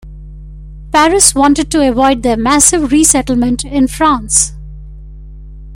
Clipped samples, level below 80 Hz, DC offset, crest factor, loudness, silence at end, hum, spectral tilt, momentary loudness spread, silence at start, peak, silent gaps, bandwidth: 0.2%; -28 dBFS; under 0.1%; 12 dB; -10 LUFS; 0 s; 50 Hz at -25 dBFS; -3 dB/octave; 7 LU; 0.05 s; 0 dBFS; none; over 20 kHz